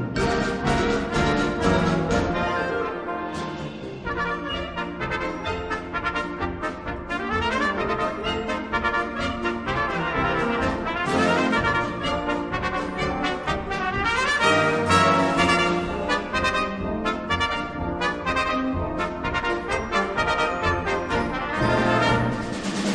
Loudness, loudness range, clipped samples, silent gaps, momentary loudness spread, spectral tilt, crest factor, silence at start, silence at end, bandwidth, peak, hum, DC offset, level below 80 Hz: -24 LUFS; 7 LU; under 0.1%; none; 9 LU; -5 dB/octave; 18 dB; 0 s; 0 s; 11 kHz; -6 dBFS; none; under 0.1%; -40 dBFS